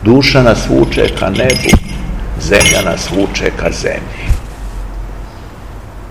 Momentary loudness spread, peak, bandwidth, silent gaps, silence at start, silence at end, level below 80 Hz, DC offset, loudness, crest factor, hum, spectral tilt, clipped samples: 22 LU; 0 dBFS; over 20 kHz; none; 0 s; 0 s; -20 dBFS; 1%; -12 LUFS; 12 dB; none; -4.5 dB/octave; 1%